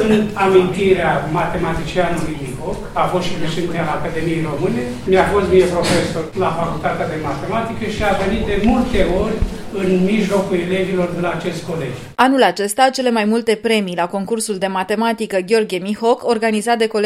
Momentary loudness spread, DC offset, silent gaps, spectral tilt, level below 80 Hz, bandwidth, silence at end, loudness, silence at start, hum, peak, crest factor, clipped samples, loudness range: 8 LU; under 0.1%; none; -5.5 dB/octave; -32 dBFS; 15.5 kHz; 0 s; -17 LUFS; 0 s; none; 0 dBFS; 16 dB; under 0.1%; 3 LU